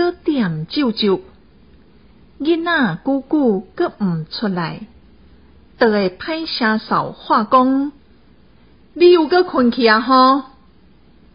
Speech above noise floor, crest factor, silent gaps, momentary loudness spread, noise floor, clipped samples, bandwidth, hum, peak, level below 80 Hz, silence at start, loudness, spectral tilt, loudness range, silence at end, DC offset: 34 dB; 16 dB; none; 11 LU; -50 dBFS; under 0.1%; 5.4 kHz; none; 0 dBFS; -52 dBFS; 0 s; -16 LUFS; -10.5 dB/octave; 5 LU; 0.9 s; 0.2%